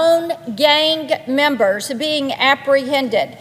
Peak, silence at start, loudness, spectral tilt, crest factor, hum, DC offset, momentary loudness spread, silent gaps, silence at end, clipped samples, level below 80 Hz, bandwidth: 0 dBFS; 0 s; -16 LUFS; -3 dB/octave; 16 dB; none; under 0.1%; 6 LU; none; 0 s; under 0.1%; -64 dBFS; 16 kHz